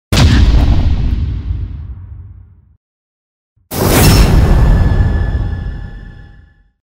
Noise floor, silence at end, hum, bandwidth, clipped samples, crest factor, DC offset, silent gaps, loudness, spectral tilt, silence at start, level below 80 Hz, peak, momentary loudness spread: -43 dBFS; 0.6 s; none; 16.5 kHz; under 0.1%; 12 dB; under 0.1%; 2.77-3.56 s; -12 LUFS; -5.5 dB/octave; 0.1 s; -14 dBFS; 0 dBFS; 22 LU